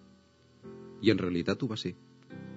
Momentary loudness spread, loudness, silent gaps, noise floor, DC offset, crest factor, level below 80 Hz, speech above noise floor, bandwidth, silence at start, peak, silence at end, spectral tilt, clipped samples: 23 LU; -31 LUFS; none; -61 dBFS; under 0.1%; 24 dB; -66 dBFS; 31 dB; 7.6 kHz; 0.65 s; -10 dBFS; 0 s; -5.5 dB/octave; under 0.1%